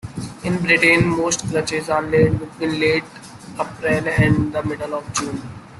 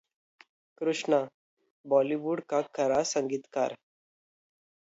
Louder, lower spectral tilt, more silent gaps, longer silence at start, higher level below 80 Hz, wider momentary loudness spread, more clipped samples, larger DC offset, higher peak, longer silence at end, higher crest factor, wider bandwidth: first, -19 LUFS vs -29 LUFS; about the same, -5 dB/octave vs -4 dB/octave; second, none vs 1.34-1.57 s, 1.70-1.84 s; second, 0.05 s vs 0.8 s; first, -44 dBFS vs -74 dBFS; first, 14 LU vs 7 LU; neither; neither; first, -2 dBFS vs -12 dBFS; second, 0 s vs 1.2 s; about the same, 18 dB vs 20 dB; first, 12.5 kHz vs 8 kHz